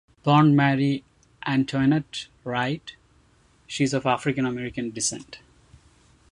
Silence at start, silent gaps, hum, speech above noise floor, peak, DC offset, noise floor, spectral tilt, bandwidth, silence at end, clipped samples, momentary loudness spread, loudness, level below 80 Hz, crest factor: 0.25 s; none; none; 37 dB; -6 dBFS; under 0.1%; -59 dBFS; -5.5 dB/octave; 11.5 kHz; 0.95 s; under 0.1%; 16 LU; -24 LUFS; -58 dBFS; 18 dB